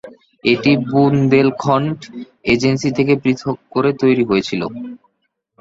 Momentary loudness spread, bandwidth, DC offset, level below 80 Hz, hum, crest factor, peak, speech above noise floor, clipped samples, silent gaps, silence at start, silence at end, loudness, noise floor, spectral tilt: 12 LU; 7.8 kHz; under 0.1%; -50 dBFS; none; 16 dB; -2 dBFS; 54 dB; under 0.1%; none; 0.05 s; 0.65 s; -16 LUFS; -70 dBFS; -6.5 dB/octave